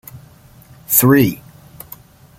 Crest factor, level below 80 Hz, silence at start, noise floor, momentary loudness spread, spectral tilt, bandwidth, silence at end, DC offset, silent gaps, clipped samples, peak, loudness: 18 dB; -50 dBFS; 0.15 s; -44 dBFS; 25 LU; -5 dB/octave; 17 kHz; 1.05 s; under 0.1%; none; under 0.1%; 0 dBFS; -13 LUFS